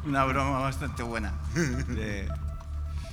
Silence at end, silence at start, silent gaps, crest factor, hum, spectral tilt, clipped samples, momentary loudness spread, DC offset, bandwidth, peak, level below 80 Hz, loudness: 0 s; 0 s; none; 20 dB; none; -6 dB/octave; under 0.1%; 10 LU; under 0.1%; 15.5 kHz; -10 dBFS; -36 dBFS; -31 LUFS